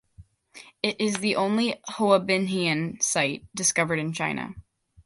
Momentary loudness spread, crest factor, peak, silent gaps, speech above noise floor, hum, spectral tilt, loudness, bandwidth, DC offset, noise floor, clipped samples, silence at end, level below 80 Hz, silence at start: 7 LU; 20 dB; -6 dBFS; none; 28 dB; none; -3.5 dB/octave; -25 LUFS; 11.5 kHz; under 0.1%; -53 dBFS; under 0.1%; 0.45 s; -60 dBFS; 0.2 s